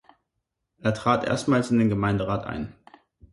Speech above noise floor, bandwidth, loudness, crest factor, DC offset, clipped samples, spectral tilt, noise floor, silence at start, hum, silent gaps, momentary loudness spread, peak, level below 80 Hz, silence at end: 57 dB; 11.5 kHz; -24 LUFS; 20 dB; under 0.1%; under 0.1%; -6.5 dB/octave; -80 dBFS; 0.85 s; none; none; 11 LU; -6 dBFS; -50 dBFS; 0.6 s